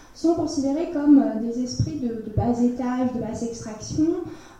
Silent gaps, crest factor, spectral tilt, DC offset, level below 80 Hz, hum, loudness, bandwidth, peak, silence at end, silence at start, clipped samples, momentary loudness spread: none; 16 dB; -7 dB/octave; under 0.1%; -46 dBFS; none; -23 LUFS; 9.2 kHz; -6 dBFS; 0 s; 0 s; under 0.1%; 12 LU